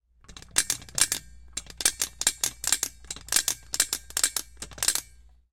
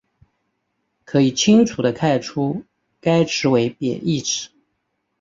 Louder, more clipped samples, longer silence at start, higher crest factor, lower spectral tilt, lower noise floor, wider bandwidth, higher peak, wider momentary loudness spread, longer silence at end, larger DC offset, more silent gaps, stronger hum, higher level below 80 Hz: second, -26 LUFS vs -19 LUFS; neither; second, 0.3 s vs 1.1 s; first, 26 dB vs 18 dB; second, 1 dB/octave vs -5 dB/octave; second, -54 dBFS vs -73 dBFS; first, 17 kHz vs 7.8 kHz; second, -6 dBFS vs -2 dBFS; about the same, 10 LU vs 11 LU; second, 0.5 s vs 0.75 s; neither; neither; neither; first, -52 dBFS vs -58 dBFS